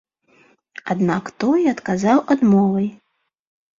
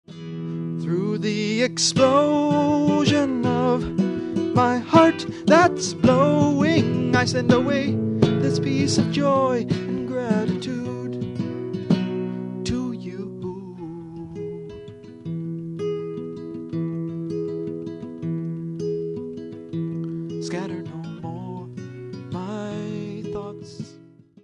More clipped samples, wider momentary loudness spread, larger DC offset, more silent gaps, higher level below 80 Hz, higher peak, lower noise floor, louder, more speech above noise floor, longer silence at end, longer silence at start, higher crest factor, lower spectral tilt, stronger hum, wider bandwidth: neither; second, 10 LU vs 17 LU; neither; neither; second, -60 dBFS vs -52 dBFS; about the same, -2 dBFS vs -2 dBFS; first, -56 dBFS vs -49 dBFS; first, -18 LUFS vs -23 LUFS; first, 39 dB vs 29 dB; first, 0.85 s vs 0.5 s; first, 0.85 s vs 0.1 s; about the same, 18 dB vs 22 dB; first, -7.5 dB/octave vs -5.5 dB/octave; neither; second, 7.6 kHz vs 11 kHz